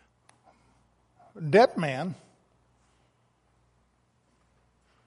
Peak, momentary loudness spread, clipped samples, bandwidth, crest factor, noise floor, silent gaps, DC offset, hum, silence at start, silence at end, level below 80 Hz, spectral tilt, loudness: -6 dBFS; 17 LU; under 0.1%; 11.5 kHz; 26 dB; -69 dBFS; none; under 0.1%; 60 Hz at -55 dBFS; 1.35 s; 2.95 s; -72 dBFS; -6.5 dB/octave; -25 LUFS